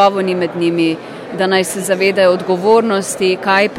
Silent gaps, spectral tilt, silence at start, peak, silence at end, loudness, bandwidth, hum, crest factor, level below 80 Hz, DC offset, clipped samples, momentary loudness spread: none; -4.5 dB/octave; 0 s; 0 dBFS; 0 s; -14 LUFS; 16 kHz; none; 14 dB; -62 dBFS; under 0.1%; under 0.1%; 6 LU